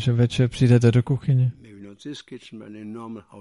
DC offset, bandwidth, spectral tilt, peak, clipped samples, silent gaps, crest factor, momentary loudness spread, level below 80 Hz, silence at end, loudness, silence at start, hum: under 0.1%; 11 kHz; -7.5 dB/octave; -4 dBFS; under 0.1%; none; 18 dB; 22 LU; -50 dBFS; 0 s; -20 LUFS; 0 s; none